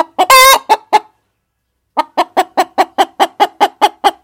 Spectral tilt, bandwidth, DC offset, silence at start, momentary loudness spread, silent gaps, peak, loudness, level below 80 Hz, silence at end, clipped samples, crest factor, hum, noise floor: 0 dB/octave; 19.5 kHz; under 0.1%; 0 s; 11 LU; none; 0 dBFS; -11 LUFS; -50 dBFS; 0.1 s; 0.2%; 12 dB; none; -68 dBFS